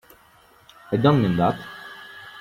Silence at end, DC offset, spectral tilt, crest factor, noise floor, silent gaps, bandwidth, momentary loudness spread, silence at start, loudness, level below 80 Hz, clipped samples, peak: 0 s; under 0.1%; -8.5 dB/octave; 20 dB; -54 dBFS; none; 15.5 kHz; 21 LU; 0.9 s; -21 LUFS; -54 dBFS; under 0.1%; -4 dBFS